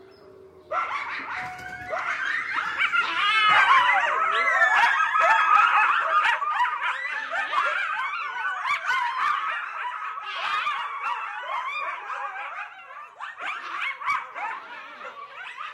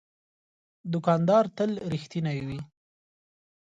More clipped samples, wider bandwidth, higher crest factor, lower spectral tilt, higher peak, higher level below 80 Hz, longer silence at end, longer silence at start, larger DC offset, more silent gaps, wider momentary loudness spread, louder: neither; first, 13 kHz vs 7.8 kHz; about the same, 18 dB vs 20 dB; second, -0.5 dB/octave vs -8 dB/octave; first, -6 dBFS vs -10 dBFS; second, -70 dBFS vs -62 dBFS; second, 0 s vs 1.05 s; second, 0.2 s vs 0.85 s; neither; neither; about the same, 18 LU vs 17 LU; first, -23 LUFS vs -27 LUFS